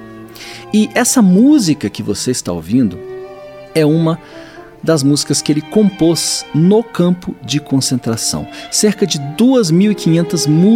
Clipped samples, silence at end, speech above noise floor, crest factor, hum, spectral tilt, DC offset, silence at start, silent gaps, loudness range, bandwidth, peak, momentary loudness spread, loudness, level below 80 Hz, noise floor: under 0.1%; 0 s; 20 dB; 12 dB; none; -5 dB/octave; under 0.1%; 0 s; none; 2 LU; 16.5 kHz; 0 dBFS; 17 LU; -13 LUFS; -48 dBFS; -32 dBFS